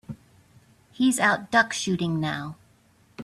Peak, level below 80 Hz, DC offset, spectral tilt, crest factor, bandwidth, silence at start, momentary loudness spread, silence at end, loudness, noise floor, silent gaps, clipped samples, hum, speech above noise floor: -6 dBFS; -62 dBFS; under 0.1%; -4 dB/octave; 20 dB; 14 kHz; 0.1 s; 19 LU; 0 s; -24 LUFS; -60 dBFS; none; under 0.1%; none; 36 dB